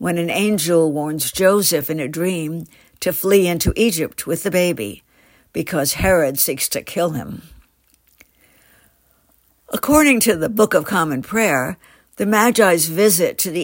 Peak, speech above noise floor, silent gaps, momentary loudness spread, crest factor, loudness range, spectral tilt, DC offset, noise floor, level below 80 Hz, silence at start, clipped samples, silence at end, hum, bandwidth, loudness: -2 dBFS; 41 dB; none; 13 LU; 18 dB; 5 LU; -4 dB/octave; under 0.1%; -59 dBFS; -42 dBFS; 0 s; under 0.1%; 0 s; none; 16.5 kHz; -17 LUFS